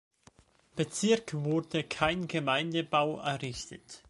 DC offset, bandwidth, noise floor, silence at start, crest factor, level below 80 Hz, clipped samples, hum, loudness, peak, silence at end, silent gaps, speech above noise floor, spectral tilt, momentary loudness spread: under 0.1%; 11.5 kHz; -62 dBFS; 0.75 s; 22 dB; -60 dBFS; under 0.1%; none; -31 LUFS; -10 dBFS; 0.1 s; none; 31 dB; -4.5 dB/octave; 10 LU